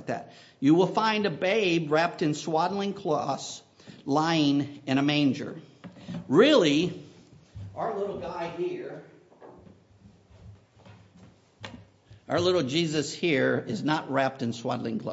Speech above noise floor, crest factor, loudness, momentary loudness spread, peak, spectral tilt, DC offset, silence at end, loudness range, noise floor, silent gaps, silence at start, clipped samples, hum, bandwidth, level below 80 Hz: 30 dB; 20 dB; -26 LUFS; 19 LU; -8 dBFS; -5.5 dB/octave; under 0.1%; 0 s; 12 LU; -56 dBFS; none; 0 s; under 0.1%; none; 8 kHz; -64 dBFS